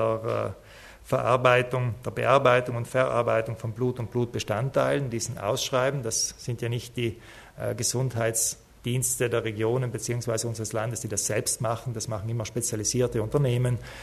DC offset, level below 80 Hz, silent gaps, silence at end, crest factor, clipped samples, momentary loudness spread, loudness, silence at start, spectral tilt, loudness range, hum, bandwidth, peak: under 0.1%; -54 dBFS; none; 0 s; 20 dB; under 0.1%; 9 LU; -27 LUFS; 0 s; -4.5 dB/octave; 4 LU; none; 13.5 kHz; -6 dBFS